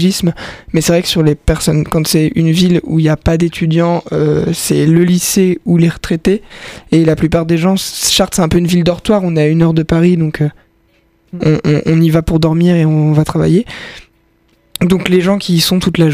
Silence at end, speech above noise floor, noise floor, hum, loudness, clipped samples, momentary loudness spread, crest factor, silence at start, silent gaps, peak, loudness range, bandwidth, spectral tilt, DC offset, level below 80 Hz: 0 s; 42 dB; -54 dBFS; none; -12 LUFS; under 0.1%; 6 LU; 12 dB; 0 s; none; 0 dBFS; 1 LU; 16 kHz; -5.5 dB/octave; under 0.1%; -32 dBFS